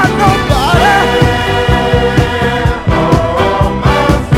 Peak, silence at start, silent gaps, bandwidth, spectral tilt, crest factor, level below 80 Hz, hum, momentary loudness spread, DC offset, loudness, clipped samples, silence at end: 0 dBFS; 0 s; none; 16 kHz; -6 dB/octave; 10 dB; -20 dBFS; none; 4 LU; under 0.1%; -10 LUFS; 0.4%; 0 s